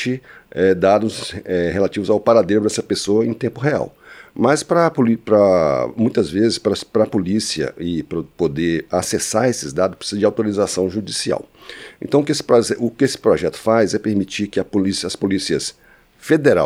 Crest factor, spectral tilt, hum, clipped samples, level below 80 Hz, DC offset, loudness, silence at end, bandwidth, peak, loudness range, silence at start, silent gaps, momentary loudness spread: 16 dB; -5 dB/octave; none; under 0.1%; -50 dBFS; under 0.1%; -18 LUFS; 0 s; 15.5 kHz; -2 dBFS; 3 LU; 0 s; none; 9 LU